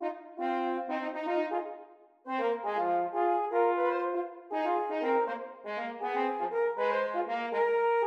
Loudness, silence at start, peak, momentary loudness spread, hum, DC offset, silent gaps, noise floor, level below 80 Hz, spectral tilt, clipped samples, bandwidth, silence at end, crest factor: -31 LUFS; 0 s; -16 dBFS; 9 LU; none; under 0.1%; none; -53 dBFS; -88 dBFS; -5.5 dB/octave; under 0.1%; 6.6 kHz; 0 s; 14 dB